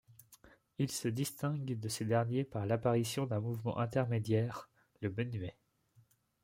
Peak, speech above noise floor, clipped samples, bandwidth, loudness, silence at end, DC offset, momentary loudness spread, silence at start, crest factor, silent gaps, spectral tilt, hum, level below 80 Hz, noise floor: -18 dBFS; 34 dB; under 0.1%; 16.5 kHz; -36 LUFS; 0.9 s; under 0.1%; 8 LU; 0.1 s; 18 dB; none; -6 dB/octave; none; -70 dBFS; -69 dBFS